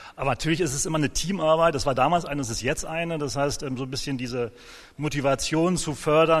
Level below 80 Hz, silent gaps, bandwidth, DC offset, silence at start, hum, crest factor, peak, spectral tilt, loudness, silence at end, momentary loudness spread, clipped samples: -42 dBFS; none; 13 kHz; under 0.1%; 0 s; none; 18 dB; -6 dBFS; -4.5 dB/octave; -25 LUFS; 0 s; 9 LU; under 0.1%